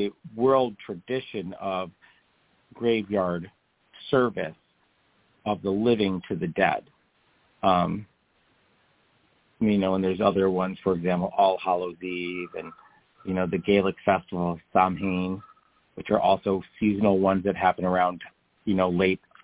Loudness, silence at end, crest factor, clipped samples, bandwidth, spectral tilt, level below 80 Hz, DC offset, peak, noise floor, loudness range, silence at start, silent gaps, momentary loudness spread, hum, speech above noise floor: -26 LUFS; 0.3 s; 20 dB; under 0.1%; 4 kHz; -10.5 dB/octave; -54 dBFS; under 0.1%; -6 dBFS; -67 dBFS; 4 LU; 0 s; none; 13 LU; none; 42 dB